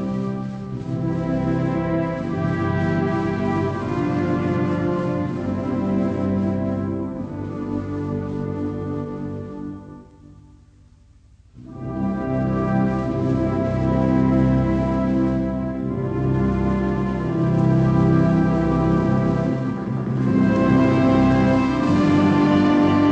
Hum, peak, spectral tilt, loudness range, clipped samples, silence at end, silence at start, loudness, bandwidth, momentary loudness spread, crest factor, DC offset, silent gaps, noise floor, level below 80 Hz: none; -4 dBFS; -9 dB/octave; 10 LU; under 0.1%; 0 s; 0 s; -21 LUFS; 8.2 kHz; 11 LU; 16 dB; under 0.1%; none; -50 dBFS; -38 dBFS